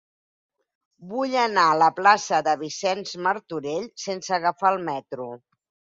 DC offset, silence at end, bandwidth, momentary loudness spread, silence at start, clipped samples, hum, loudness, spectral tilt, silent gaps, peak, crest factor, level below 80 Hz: under 0.1%; 0.6 s; 7.8 kHz; 13 LU; 1 s; under 0.1%; none; -23 LUFS; -3.5 dB/octave; none; -4 dBFS; 20 dB; -72 dBFS